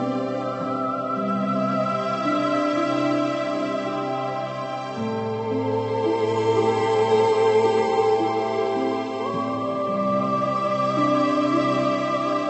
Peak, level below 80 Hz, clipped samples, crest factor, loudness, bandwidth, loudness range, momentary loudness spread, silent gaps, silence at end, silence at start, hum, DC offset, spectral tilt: -8 dBFS; -66 dBFS; under 0.1%; 14 dB; -23 LUFS; 8.4 kHz; 4 LU; 7 LU; none; 0 s; 0 s; none; under 0.1%; -6.5 dB/octave